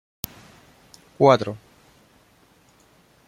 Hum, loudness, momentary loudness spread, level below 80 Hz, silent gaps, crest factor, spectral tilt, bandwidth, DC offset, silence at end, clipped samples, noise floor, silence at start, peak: none; -19 LUFS; 19 LU; -60 dBFS; none; 24 dB; -6 dB/octave; 16.5 kHz; under 0.1%; 1.7 s; under 0.1%; -57 dBFS; 1.2 s; -2 dBFS